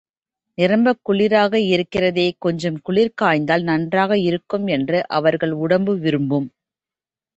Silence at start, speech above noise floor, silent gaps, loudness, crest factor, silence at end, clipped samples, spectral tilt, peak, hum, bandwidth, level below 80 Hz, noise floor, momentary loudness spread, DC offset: 0.6 s; over 72 dB; none; -18 LUFS; 16 dB; 0.9 s; under 0.1%; -7 dB/octave; -2 dBFS; none; 8.2 kHz; -58 dBFS; under -90 dBFS; 6 LU; under 0.1%